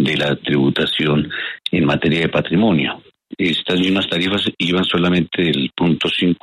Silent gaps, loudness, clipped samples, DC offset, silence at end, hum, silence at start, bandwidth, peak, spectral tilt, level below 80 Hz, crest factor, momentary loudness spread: none; -17 LUFS; under 0.1%; under 0.1%; 0.1 s; none; 0 s; 12 kHz; -4 dBFS; -6.5 dB/octave; -48 dBFS; 14 dB; 3 LU